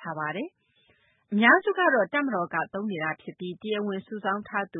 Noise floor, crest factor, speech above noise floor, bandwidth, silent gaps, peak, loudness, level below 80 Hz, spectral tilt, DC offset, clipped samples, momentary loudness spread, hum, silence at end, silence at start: -65 dBFS; 22 dB; 39 dB; 3.9 kHz; none; -6 dBFS; -26 LUFS; -76 dBFS; -9.5 dB/octave; under 0.1%; under 0.1%; 17 LU; none; 0 s; 0 s